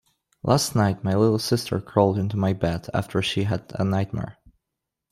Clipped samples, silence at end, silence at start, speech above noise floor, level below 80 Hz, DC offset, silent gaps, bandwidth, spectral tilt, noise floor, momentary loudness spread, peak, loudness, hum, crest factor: under 0.1%; 0.8 s; 0.45 s; 61 dB; -52 dBFS; under 0.1%; none; 15 kHz; -6 dB/octave; -84 dBFS; 7 LU; -4 dBFS; -24 LUFS; none; 20 dB